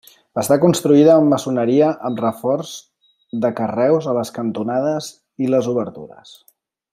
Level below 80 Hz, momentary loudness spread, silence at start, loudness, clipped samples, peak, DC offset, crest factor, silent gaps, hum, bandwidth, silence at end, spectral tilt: -64 dBFS; 17 LU; 0.35 s; -17 LUFS; under 0.1%; -2 dBFS; under 0.1%; 16 dB; none; none; 16 kHz; 0.85 s; -6.5 dB/octave